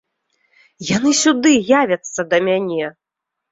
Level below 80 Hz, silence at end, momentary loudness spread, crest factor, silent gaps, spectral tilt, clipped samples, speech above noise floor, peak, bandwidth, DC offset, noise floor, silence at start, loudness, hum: -58 dBFS; 0.6 s; 11 LU; 16 dB; none; -3.5 dB/octave; under 0.1%; 65 dB; -2 dBFS; 8 kHz; under 0.1%; -81 dBFS; 0.8 s; -16 LUFS; none